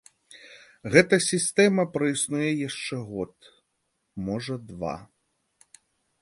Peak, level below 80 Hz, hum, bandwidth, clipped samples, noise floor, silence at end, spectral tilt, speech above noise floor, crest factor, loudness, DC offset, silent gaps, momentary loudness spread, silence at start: -2 dBFS; -60 dBFS; none; 12 kHz; under 0.1%; -76 dBFS; 1.2 s; -4 dB/octave; 51 dB; 26 dB; -25 LUFS; under 0.1%; none; 17 LU; 0.35 s